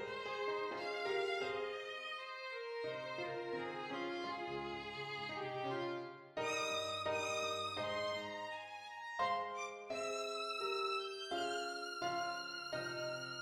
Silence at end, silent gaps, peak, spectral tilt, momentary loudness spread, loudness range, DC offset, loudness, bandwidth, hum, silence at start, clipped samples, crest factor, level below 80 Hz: 0 s; none; -26 dBFS; -3 dB/octave; 7 LU; 3 LU; under 0.1%; -41 LUFS; 16.5 kHz; none; 0 s; under 0.1%; 16 dB; -78 dBFS